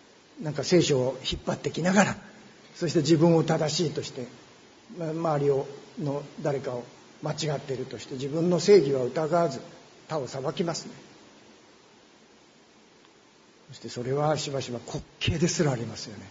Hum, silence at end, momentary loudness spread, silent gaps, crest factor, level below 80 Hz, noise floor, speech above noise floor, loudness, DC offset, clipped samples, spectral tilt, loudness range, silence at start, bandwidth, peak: none; 0 s; 17 LU; none; 24 dB; -56 dBFS; -57 dBFS; 31 dB; -27 LUFS; under 0.1%; under 0.1%; -5.5 dB/octave; 11 LU; 0.35 s; 7.8 kHz; -4 dBFS